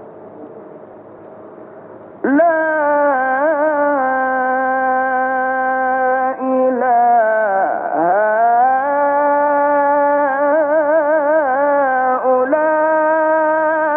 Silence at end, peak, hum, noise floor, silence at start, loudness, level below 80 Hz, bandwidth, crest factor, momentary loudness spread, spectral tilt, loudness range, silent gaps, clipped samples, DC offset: 0 s; -4 dBFS; none; -37 dBFS; 0 s; -15 LUFS; -72 dBFS; 3.4 kHz; 10 dB; 4 LU; -4.5 dB/octave; 2 LU; none; under 0.1%; under 0.1%